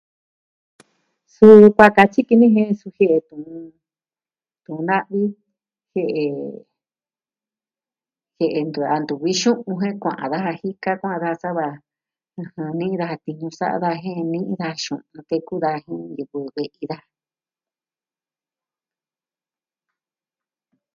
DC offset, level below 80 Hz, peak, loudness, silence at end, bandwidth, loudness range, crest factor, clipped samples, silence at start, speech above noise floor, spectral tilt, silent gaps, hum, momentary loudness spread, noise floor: under 0.1%; -60 dBFS; 0 dBFS; -18 LUFS; 4 s; 7.6 kHz; 15 LU; 20 dB; 0.2%; 1.4 s; over 72 dB; -6 dB/octave; none; none; 19 LU; under -90 dBFS